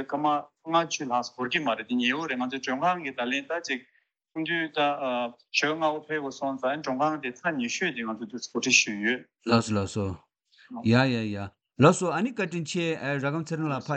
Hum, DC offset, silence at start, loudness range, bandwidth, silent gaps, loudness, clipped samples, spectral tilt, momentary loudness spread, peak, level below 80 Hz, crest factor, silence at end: none; under 0.1%; 0 s; 3 LU; 9 kHz; none; -27 LUFS; under 0.1%; -4.5 dB/octave; 11 LU; -6 dBFS; -68 dBFS; 22 dB; 0 s